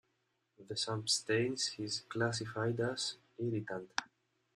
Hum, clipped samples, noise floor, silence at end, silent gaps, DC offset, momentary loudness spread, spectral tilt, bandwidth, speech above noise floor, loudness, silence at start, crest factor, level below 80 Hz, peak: none; under 0.1%; -81 dBFS; 0.5 s; none; under 0.1%; 8 LU; -3.5 dB/octave; 13.5 kHz; 44 dB; -37 LUFS; 0.6 s; 26 dB; -74 dBFS; -12 dBFS